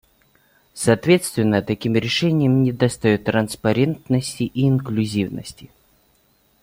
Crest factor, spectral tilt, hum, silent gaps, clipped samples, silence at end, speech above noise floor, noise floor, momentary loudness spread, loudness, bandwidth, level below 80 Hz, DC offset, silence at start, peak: 18 dB; -6 dB/octave; none; none; under 0.1%; 1 s; 41 dB; -60 dBFS; 6 LU; -20 LUFS; 16.5 kHz; -52 dBFS; under 0.1%; 0.75 s; -2 dBFS